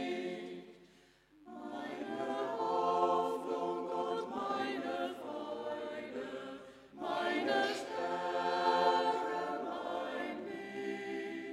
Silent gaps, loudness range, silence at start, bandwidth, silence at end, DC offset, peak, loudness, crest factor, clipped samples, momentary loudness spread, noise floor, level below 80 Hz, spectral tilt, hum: none; 5 LU; 0 s; 15 kHz; 0 s; under 0.1%; -18 dBFS; -37 LUFS; 20 dB; under 0.1%; 13 LU; -65 dBFS; -78 dBFS; -4.5 dB/octave; none